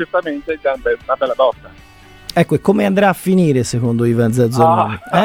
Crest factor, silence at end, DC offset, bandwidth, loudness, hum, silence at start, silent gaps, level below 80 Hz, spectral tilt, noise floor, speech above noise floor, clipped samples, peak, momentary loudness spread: 16 dB; 0 s; 0.1%; 16.5 kHz; -15 LUFS; none; 0 s; none; -46 dBFS; -6.5 dB/octave; -35 dBFS; 21 dB; under 0.1%; 0 dBFS; 7 LU